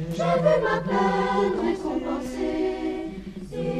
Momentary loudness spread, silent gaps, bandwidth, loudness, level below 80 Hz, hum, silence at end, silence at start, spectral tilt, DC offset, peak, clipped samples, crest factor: 12 LU; none; 13.5 kHz; -25 LUFS; -46 dBFS; none; 0 s; 0 s; -6.5 dB/octave; under 0.1%; -8 dBFS; under 0.1%; 16 dB